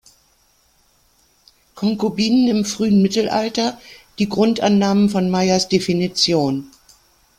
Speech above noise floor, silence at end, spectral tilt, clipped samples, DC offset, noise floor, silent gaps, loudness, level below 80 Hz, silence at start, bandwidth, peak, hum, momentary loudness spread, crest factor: 42 dB; 0.7 s; -5 dB/octave; under 0.1%; under 0.1%; -59 dBFS; none; -18 LUFS; -54 dBFS; 1.75 s; 14 kHz; -2 dBFS; none; 8 LU; 16 dB